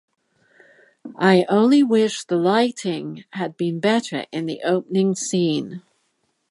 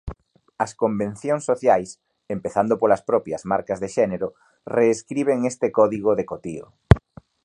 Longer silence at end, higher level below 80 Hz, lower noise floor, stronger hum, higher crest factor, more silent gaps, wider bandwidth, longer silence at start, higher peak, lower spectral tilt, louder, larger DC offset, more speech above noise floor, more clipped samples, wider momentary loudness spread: first, 0.7 s vs 0.45 s; second, -72 dBFS vs -38 dBFS; first, -70 dBFS vs -44 dBFS; neither; about the same, 20 dB vs 22 dB; neither; about the same, 11.5 kHz vs 11 kHz; first, 1.05 s vs 0.05 s; about the same, -2 dBFS vs 0 dBFS; second, -5.5 dB/octave vs -7 dB/octave; about the same, -20 LUFS vs -22 LUFS; neither; first, 50 dB vs 23 dB; neither; about the same, 14 LU vs 12 LU